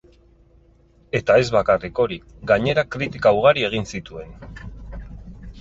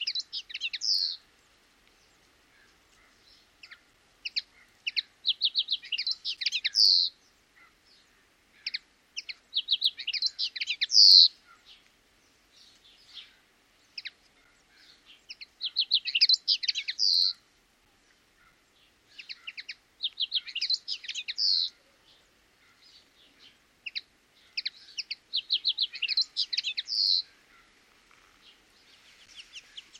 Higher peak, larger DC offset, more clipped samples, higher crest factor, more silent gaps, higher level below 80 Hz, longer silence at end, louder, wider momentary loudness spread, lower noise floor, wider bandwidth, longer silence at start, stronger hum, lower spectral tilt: first, -2 dBFS vs -6 dBFS; neither; neither; about the same, 20 dB vs 24 dB; neither; first, -42 dBFS vs -76 dBFS; second, 0 s vs 0.2 s; first, -19 LUFS vs -25 LUFS; about the same, 22 LU vs 22 LU; second, -54 dBFS vs -65 dBFS; second, 8 kHz vs 15.5 kHz; first, 1.15 s vs 0 s; neither; first, -5.5 dB/octave vs 4 dB/octave